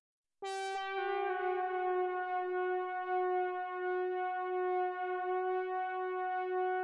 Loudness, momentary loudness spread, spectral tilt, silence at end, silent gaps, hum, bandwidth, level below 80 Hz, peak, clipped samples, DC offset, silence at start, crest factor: -36 LUFS; 3 LU; -2 dB/octave; 0 s; none; none; 10.5 kHz; -86 dBFS; -26 dBFS; under 0.1%; under 0.1%; 0.4 s; 10 dB